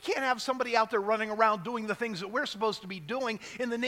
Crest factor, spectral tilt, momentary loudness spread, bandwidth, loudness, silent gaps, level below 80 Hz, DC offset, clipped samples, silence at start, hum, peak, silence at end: 22 dB; -4 dB/octave; 8 LU; 16.5 kHz; -30 LUFS; none; -72 dBFS; under 0.1%; under 0.1%; 0 s; none; -10 dBFS; 0 s